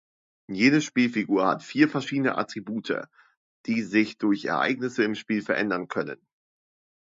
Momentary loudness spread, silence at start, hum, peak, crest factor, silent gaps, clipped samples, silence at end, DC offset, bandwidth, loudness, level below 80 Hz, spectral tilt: 10 LU; 0.5 s; none; -6 dBFS; 20 dB; 3.37-3.64 s; under 0.1%; 0.9 s; under 0.1%; 7.8 kHz; -25 LUFS; -72 dBFS; -5.5 dB/octave